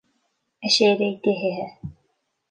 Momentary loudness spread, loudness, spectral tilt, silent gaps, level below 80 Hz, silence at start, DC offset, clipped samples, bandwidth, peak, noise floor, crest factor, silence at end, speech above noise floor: 20 LU; -21 LUFS; -4 dB/octave; none; -58 dBFS; 0.6 s; under 0.1%; under 0.1%; 10 kHz; -6 dBFS; -72 dBFS; 18 dB; 0.6 s; 51 dB